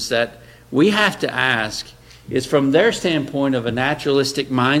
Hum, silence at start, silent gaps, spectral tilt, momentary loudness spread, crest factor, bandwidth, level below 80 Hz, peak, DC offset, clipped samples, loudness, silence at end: none; 0 s; none; -4.5 dB/octave; 10 LU; 18 dB; 16 kHz; -50 dBFS; 0 dBFS; under 0.1%; under 0.1%; -18 LUFS; 0 s